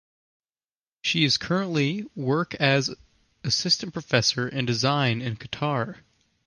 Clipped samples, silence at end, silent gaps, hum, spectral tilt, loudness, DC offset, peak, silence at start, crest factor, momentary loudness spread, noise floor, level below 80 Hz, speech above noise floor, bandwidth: under 0.1%; 0.5 s; none; none; -4 dB/octave; -24 LUFS; under 0.1%; -4 dBFS; 1.05 s; 22 dB; 9 LU; under -90 dBFS; -60 dBFS; over 65 dB; 11 kHz